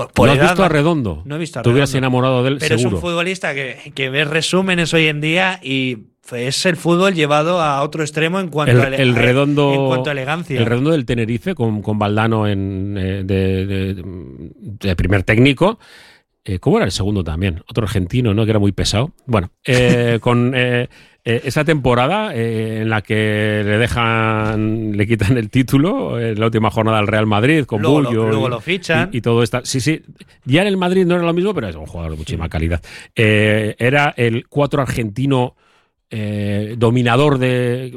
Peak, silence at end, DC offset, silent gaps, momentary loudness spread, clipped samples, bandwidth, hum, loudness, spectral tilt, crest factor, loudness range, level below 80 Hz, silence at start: 0 dBFS; 0 s; under 0.1%; none; 10 LU; under 0.1%; 14 kHz; none; -16 LUFS; -6 dB/octave; 16 dB; 3 LU; -38 dBFS; 0 s